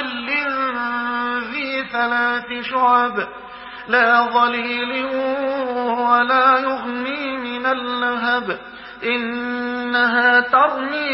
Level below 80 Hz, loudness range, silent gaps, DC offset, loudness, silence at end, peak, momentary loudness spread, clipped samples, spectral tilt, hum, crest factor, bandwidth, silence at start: -58 dBFS; 3 LU; none; under 0.1%; -18 LUFS; 0 s; -2 dBFS; 10 LU; under 0.1%; -8 dB/octave; none; 16 dB; 5.8 kHz; 0 s